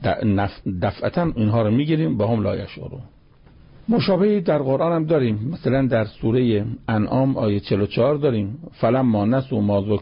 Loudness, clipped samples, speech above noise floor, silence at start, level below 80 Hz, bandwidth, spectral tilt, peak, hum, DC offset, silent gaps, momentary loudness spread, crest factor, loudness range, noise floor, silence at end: -21 LUFS; under 0.1%; 29 dB; 0 s; -44 dBFS; 5.4 kHz; -12.5 dB/octave; -8 dBFS; none; under 0.1%; none; 7 LU; 12 dB; 2 LU; -49 dBFS; 0 s